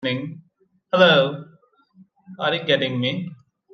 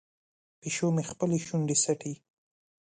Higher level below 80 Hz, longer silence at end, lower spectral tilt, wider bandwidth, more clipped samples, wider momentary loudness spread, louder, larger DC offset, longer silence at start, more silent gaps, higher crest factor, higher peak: about the same, -70 dBFS vs -70 dBFS; second, 0.4 s vs 0.75 s; first, -6.5 dB/octave vs -4.5 dB/octave; second, 6.4 kHz vs 9.6 kHz; neither; first, 20 LU vs 15 LU; first, -20 LUFS vs -29 LUFS; neither; second, 0 s vs 0.65 s; neither; about the same, 20 dB vs 18 dB; first, -2 dBFS vs -14 dBFS